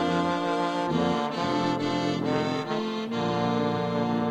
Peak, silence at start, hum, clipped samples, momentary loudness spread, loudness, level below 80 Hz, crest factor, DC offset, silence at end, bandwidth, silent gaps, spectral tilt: -12 dBFS; 0 s; none; under 0.1%; 3 LU; -27 LUFS; -58 dBFS; 14 dB; under 0.1%; 0 s; 10.5 kHz; none; -6 dB/octave